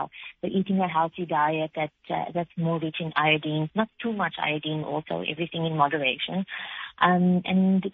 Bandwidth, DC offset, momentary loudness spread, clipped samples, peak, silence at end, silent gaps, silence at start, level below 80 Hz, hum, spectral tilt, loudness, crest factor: 4.1 kHz; under 0.1%; 9 LU; under 0.1%; -4 dBFS; 0.05 s; none; 0 s; -66 dBFS; none; -4.5 dB/octave; -26 LUFS; 22 dB